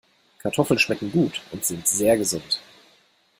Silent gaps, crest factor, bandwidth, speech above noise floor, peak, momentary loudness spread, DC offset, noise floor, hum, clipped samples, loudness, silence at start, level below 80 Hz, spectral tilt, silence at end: none; 20 dB; 16.5 kHz; 38 dB; -4 dBFS; 8 LU; under 0.1%; -60 dBFS; none; under 0.1%; -22 LUFS; 0.45 s; -58 dBFS; -3.5 dB/octave; 0.8 s